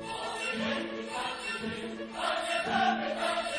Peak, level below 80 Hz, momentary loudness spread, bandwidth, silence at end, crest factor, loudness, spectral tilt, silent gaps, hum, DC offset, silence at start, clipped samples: -16 dBFS; -64 dBFS; 8 LU; 10.5 kHz; 0 s; 18 dB; -32 LUFS; -3 dB/octave; none; none; under 0.1%; 0 s; under 0.1%